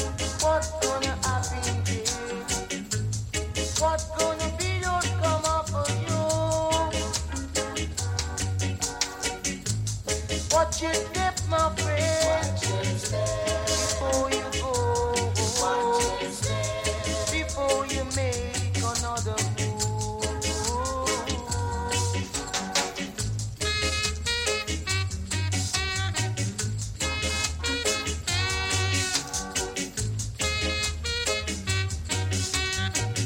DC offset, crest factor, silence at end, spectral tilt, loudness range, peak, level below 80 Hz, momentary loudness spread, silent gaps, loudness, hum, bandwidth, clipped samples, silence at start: under 0.1%; 18 dB; 0 s; -3 dB/octave; 2 LU; -10 dBFS; -38 dBFS; 5 LU; none; -27 LUFS; none; 16.5 kHz; under 0.1%; 0 s